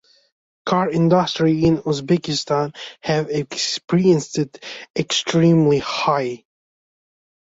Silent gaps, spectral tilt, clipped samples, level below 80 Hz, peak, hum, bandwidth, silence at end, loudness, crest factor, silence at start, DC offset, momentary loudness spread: 3.84-3.88 s, 4.90-4.94 s; -5.5 dB/octave; under 0.1%; -54 dBFS; -4 dBFS; none; 8 kHz; 1.1 s; -19 LUFS; 16 dB; 0.65 s; under 0.1%; 11 LU